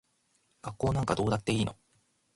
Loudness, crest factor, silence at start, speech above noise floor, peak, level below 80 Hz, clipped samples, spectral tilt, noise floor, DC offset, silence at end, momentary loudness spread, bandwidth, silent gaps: -31 LUFS; 18 dB; 0.65 s; 43 dB; -14 dBFS; -52 dBFS; under 0.1%; -6 dB/octave; -72 dBFS; under 0.1%; 0.6 s; 13 LU; 11.5 kHz; none